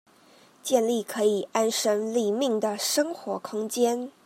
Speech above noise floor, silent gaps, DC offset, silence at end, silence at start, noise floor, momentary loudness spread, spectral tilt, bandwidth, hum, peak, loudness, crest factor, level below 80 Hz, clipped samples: 31 dB; none; under 0.1%; 0.15 s; 0.65 s; -56 dBFS; 7 LU; -3 dB/octave; 16 kHz; none; -8 dBFS; -26 LUFS; 18 dB; -84 dBFS; under 0.1%